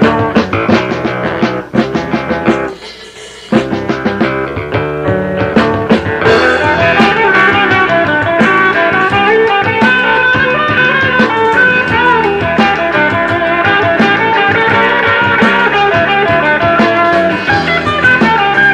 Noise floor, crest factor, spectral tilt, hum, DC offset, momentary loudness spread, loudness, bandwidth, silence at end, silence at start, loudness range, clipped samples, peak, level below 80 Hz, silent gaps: -30 dBFS; 10 dB; -6 dB/octave; none; under 0.1%; 7 LU; -10 LUFS; 10.5 kHz; 0 s; 0 s; 6 LU; under 0.1%; 0 dBFS; -38 dBFS; none